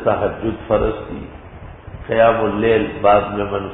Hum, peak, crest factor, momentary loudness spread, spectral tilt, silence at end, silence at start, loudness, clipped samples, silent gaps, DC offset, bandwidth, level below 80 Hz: none; -2 dBFS; 16 dB; 22 LU; -11.5 dB/octave; 0 s; 0 s; -17 LUFS; under 0.1%; none; under 0.1%; 4 kHz; -36 dBFS